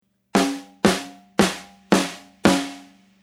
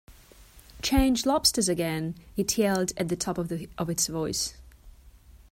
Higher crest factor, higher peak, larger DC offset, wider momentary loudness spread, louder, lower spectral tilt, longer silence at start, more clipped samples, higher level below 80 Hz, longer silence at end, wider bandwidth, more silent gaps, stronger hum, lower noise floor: about the same, 22 dB vs 20 dB; first, 0 dBFS vs -8 dBFS; neither; about the same, 9 LU vs 10 LU; first, -22 LUFS vs -27 LUFS; about the same, -4.5 dB/octave vs -3.5 dB/octave; first, 0.35 s vs 0.1 s; neither; second, -52 dBFS vs -42 dBFS; first, 0.4 s vs 0.1 s; about the same, 16 kHz vs 16.5 kHz; neither; neither; second, -45 dBFS vs -52 dBFS